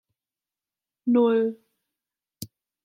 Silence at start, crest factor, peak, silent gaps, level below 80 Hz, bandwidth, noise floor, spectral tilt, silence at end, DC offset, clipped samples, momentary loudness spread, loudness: 1.05 s; 16 dB; -12 dBFS; none; -76 dBFS; 16.5 kHz; under -90 dBFS; -6.5 dB/octave; 0.4 s; under 0.1%; under 0.1%; 22 LU; -23 LUFS